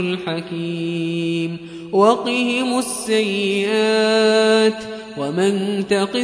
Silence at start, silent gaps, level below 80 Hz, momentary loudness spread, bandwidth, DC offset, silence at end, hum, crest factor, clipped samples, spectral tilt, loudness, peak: 0 s; none; -62 dBFS; 11 LU; 11 kHz; under 0.1%; 0 s; none; 18 dB; under 0.1%; -4.5 dB/octave; -18 LUFS; -2 dBFS